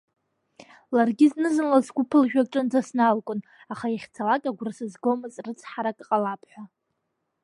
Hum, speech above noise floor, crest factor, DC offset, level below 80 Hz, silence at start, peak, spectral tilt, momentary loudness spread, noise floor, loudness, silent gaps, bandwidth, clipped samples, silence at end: none; 54 dB; 20 dB; under 0.1%; -78 dBFS; 0.9 s; -6 dBFS; -6 dB/octave; 14 LU; -78 dBFS; -24 LUFS; none; 11.5 kHz; under 0.1%; 0.75 s